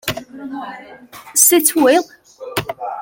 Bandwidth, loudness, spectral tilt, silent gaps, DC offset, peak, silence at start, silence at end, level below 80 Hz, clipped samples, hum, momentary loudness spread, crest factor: 17 kHz; -14 LUFS; -2 dB/octave; none; under 0.1%; 0 dBFS; 0.05 s; 0 s; -54 dBFS; under 0.1%; none; 23 LU; 18 dB